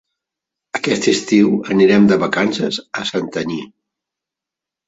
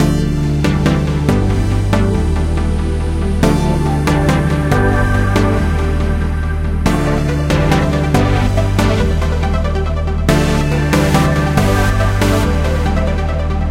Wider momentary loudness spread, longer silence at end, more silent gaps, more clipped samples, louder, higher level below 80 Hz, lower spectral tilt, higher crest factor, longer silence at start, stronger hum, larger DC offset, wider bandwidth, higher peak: first, 11 LU vs 4 LU; first, 1.2 s vs 0 s; neither; neither; about the same, -16 LUFS vs -15 LUFS; second, -56 dBFS vs -18 dBFS; second, -5 dB/octave vs -6.5 dB/octave; about the same, 16 dB vs 14 dB; first, 0.75 s vs 0 s; neither; second, under 0.1% vs 0.4%; second, 8 kHz vs 16 kHz; about the same, -2 dBFS vs 0 dBFS